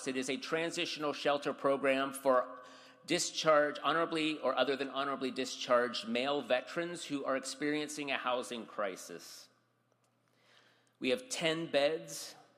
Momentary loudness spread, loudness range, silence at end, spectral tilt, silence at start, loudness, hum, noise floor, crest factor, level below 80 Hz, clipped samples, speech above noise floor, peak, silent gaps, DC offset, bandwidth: 10 LU; 7 LU; 0.2 s; -3 dB/octave; 0 s; -34 LUFS; none; -75 dBFS; 20 dB; -82 dBFS; under 0.1%; 40 dB; -14 dBFS; none; under 0.1%; 15 kHz